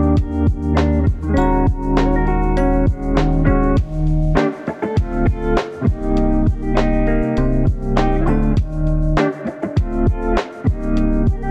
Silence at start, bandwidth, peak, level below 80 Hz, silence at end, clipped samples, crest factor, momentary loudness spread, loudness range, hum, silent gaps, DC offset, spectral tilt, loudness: 0 s; 7.8 kHz; 0 dBFS; -20 dBFS; 0 s; under 0.1%; 14 dB; 4 LU; 2 LU; none; none; under 0.1%; -8.5 dB/octave; -18 LUFS